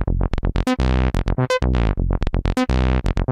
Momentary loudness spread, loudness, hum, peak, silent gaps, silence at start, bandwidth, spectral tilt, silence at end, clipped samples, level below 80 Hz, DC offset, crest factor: 4 LU; -21 LUFS; none; -6 dBFS; none; 0 s; 10.5 kHz; -7 dB/octave; 0 s; under 0.1%; -22 dBFS; under 0.1%; 14 dB